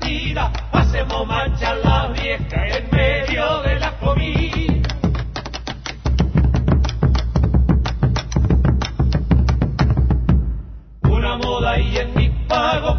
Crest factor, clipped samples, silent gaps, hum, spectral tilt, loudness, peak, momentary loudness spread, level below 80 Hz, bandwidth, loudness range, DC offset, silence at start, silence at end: 14 dB; under 0.1%; none; none; -7 dB/octave; -19 LUFS; -4 dBFS; 5 LU; -20 dBFS; 6.6 kHz; 2 LU; under 0.1%; 0 s; 0 s